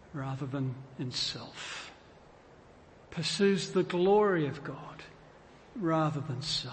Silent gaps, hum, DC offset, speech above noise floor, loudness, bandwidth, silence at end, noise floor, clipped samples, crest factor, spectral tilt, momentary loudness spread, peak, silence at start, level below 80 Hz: none; none; under 0.1%; 25 dB; -31 LUFS; 8.8 kHz; 0 s; -56 dBFS; under 0.1%; 18 dB; -5 dB/octave; 19 LU; -14 dBFS; 0.1 s; -64 dBFS